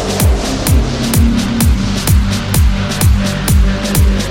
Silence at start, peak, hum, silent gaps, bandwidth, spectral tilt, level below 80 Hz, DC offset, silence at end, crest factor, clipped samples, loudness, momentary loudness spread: 0 s; 0 dBFS; none; none; 17 kHz; -5 dB/octave; -16 dBFS; under 0.1%; 0 s; 12 dB; under 0.1%; -13 LUFS; 2 LU